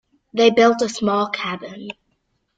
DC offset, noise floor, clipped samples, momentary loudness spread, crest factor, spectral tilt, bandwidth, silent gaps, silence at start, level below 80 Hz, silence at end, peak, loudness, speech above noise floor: under 0.1%; -69 dBFS; under 0.1%; 21 LU; 18 dB; -4 dB/octave; 9.2 kHz; none; 0.35 s; -62 dBFS; 0.65 s; -2 dBFS; -18 LUFS; 51 dB